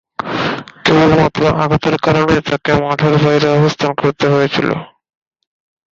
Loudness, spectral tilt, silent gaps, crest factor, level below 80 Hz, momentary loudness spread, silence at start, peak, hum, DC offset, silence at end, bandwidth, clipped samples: -13 LUFS; -6.5 dB/octave; none; 12 dB; -40 dBFS; 7 LU; 0.2 s; -2 dBFS; none; under 0.1%; 1.05 s; 7.6 kHz; under 0.1%